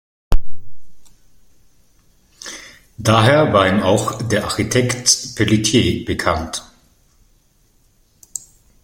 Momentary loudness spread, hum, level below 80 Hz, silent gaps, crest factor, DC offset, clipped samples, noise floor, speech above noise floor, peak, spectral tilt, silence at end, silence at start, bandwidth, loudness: 18 LU; none; -30 dBFS; none; 18 dB; under 0.1%; under 0.1%; -56 dBFS; 41 dB; 0 dBFS; -4 dB/octave; 0.45 s; 0.3 s; 16.5 kHz; -16 LUFS